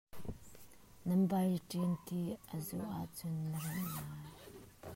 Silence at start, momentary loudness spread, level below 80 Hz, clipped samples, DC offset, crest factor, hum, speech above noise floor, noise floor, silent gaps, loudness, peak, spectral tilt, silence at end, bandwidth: 0.15 s; 21 LU; -64 dBFS; under 0.1%; under 0.1%; 16 dB; none; 22 dB; -60 dBFS; none; -39 LUFS; -24 dBFS; -7 dB/octave; 0 s; 16 kHz